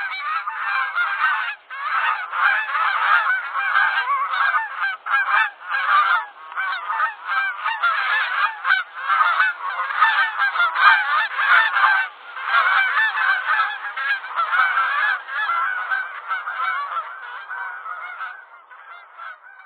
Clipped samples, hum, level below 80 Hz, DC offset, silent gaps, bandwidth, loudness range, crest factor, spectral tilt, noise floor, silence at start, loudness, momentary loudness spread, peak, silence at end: under 0.1%; none; under -90 dBFS; under 0.1%; none; 12.5 kHz; 7 LU; 22 dB; 3 dB/octave; -43 dBFS; 0 s; -19 LUFS; 13 LU; 0 dBFS; 0 s